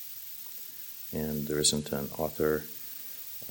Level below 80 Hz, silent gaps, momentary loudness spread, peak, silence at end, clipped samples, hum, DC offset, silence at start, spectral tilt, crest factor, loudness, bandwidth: -56 dBFS; none; 13 LU; -10 dBFS; 0 s; under 0.1%; none; under 0.1%; 0 s; -3.5 dB/octave; 22 dB; -32 LUFS; 17 kHz